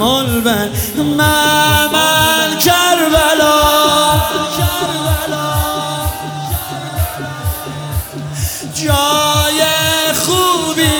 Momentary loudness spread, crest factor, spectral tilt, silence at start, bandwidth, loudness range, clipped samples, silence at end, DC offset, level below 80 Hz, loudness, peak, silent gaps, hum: 11 LU; 14 dB; -3 dB/octave; 0 s; 19 kHz; 9 LU; under 0.1%; 0 s; under 0.1%; -30 dBFS; -13 LUFS; 0 dBFS; none; none